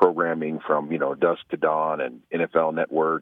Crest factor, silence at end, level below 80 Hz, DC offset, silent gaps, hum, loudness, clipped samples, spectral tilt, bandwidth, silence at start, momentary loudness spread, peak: 20 dB; 0 s; -70 dBFS; under 0.1%; none; none; -24 LUFS; under 0.1%; -8.5 dB/octave; 4 kHz; 0 s; 5 LU; -4 dBFS